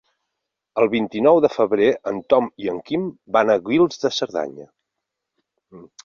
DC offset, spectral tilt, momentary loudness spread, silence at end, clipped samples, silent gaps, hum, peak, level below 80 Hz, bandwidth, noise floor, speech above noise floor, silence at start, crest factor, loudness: under 0.1%; -5.5 dB/octave; 10 LU; 0.2 s; under 0.1%; none; none; -2 dBFS; -62 dBFS; 7.4 kHz; -81 dBFS; 62 dB; 0.75 s; 18 dB; -20 LUFS